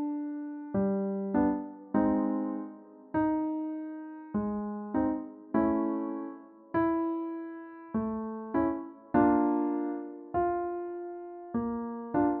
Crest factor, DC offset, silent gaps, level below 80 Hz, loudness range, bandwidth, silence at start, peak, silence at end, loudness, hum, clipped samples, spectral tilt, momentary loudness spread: 18 dB; under 0.1%; none; -60 dBFS; 3 LU; 3.2 kHz; 0 s; -12 dBFS; 0 s; -32 LUFS; none; under 0.1%; -9 dB/octave; 12 LU